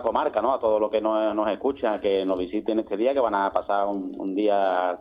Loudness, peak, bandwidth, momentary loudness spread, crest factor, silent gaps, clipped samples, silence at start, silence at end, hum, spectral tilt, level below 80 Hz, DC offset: -24 LUFS; -8 dBFS; 5.2 kHz; 4 LU; 16 dB; none; under 0.1%; 0 s; 0 s; none; -8 dB/octave; -58 dBFS; under 0.1%